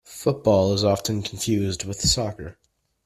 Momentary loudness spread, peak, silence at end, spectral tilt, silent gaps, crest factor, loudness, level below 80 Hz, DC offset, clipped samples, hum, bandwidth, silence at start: 10 LU; -6 dBFS; 0.55 s; -4.5 dB/octave; none; 18 dB; -23 LUFS; -44 dBFS; under 0.1%; under 0.1%; none; 15 kHz; 0.1 s